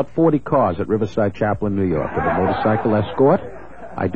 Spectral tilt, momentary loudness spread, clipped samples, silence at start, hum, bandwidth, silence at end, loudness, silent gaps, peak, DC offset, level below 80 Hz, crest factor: -9.5 dB/octave; 6 LU; under 0.1%; 0 s; none; 7.2 kHz; 0 s; -19 LUFS; none; -4 dBFS; 1%; -44 dBFS; 16 dB